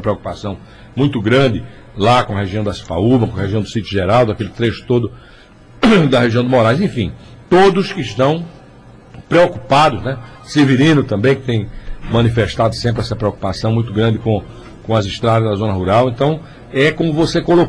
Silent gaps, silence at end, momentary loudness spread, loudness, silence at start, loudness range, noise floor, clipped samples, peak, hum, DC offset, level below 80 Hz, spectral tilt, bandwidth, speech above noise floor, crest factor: none; 0 s; 12 LU; -15 LUFS; 0 s; 3 LU; -40 dBFS; under 0.1%; -4 dBFS; none; under 0.1%; -38 dBFS; -7 dB/octave; 10.5 kHz; 26 dB; 12 dB